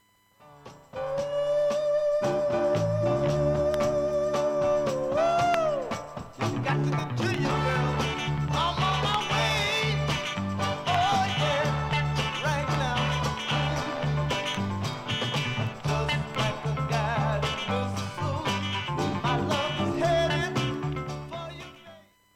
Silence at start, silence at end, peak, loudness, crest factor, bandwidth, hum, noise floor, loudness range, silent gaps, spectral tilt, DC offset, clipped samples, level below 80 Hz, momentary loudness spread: 0.45 s; 0.35 s; -6 dBFS; -27 LUFS; 20 dB; 14.5 kHz; none; -58 dBFS; 3 LU; none; -5.5 dB/octave; under 0.1%; under 0.1%; -46 dBFS; 7 LU